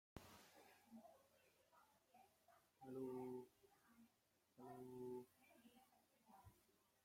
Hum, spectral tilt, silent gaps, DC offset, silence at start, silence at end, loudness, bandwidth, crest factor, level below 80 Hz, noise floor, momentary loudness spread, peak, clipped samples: none; -6 dB/octave; none; under 0.1%; 0.15 s; 0.2 s; -58 LUFS; 16.5 kHz; 22 dB; -86 dBFS; -84 dBFS; 15 LU; -40 dBFS; under 0.1%